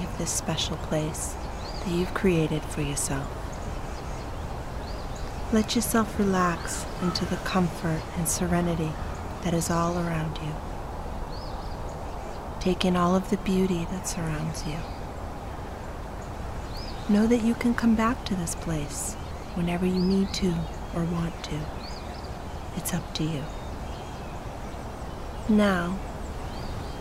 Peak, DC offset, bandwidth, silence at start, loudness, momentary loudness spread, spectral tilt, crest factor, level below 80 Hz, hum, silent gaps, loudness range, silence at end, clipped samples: -6 dBFS; under 0.1%; 16 kHz; 0 s; -29 LUFS; 13 LU; -5 dB/octave; 22 dB; -38 dBFS; none; none; 6 LU; 0 s; under 0.1%